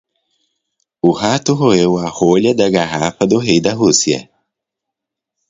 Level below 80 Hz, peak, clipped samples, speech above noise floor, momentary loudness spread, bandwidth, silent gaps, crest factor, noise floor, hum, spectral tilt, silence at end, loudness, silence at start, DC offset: -50 dBFS; 0 dBFS; under 0.1%; 68 dB; 5 LU; 7.8 kHz; none; 16 dB; -81 dBFS; none; -4.5 dB/octave; 1.3 s; -14 LUFS; 1.05 s; under 0.1%